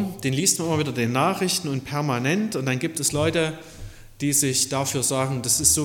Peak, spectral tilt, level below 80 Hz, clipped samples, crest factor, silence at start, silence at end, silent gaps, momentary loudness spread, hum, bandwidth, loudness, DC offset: -4 dBFS; -3.5 dB/octave; -48 dBFS; under 0.1%; 20 dB; 0 s; 0 s; none; 8 LU; none; 17.5 kHz; -22 LUFS; under 0.1%